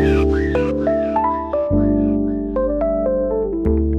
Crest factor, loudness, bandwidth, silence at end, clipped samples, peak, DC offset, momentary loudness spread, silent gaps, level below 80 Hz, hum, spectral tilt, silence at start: 12 dB; -19 LUFS; 7.6 kHz; 0 s; under 0.1%; -4 dBFS; 0.1%; 4 LU; none; -26 dBFS; none; -9.5 dB/octave; 0 s